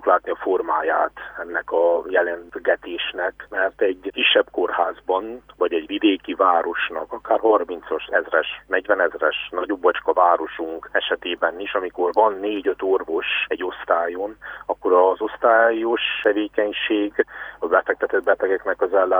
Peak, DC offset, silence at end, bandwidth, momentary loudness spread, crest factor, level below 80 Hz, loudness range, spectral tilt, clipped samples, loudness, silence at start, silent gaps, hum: -2 dBFS; under 0.1%; 0 s; over 20 kHz; 9 LU; 18 dB; -58 dBFS; 2 LU; -5.5 dB/octave; under 0.1%; -21 LUFS; 0 s; none; 50 Hz at -60 dBFS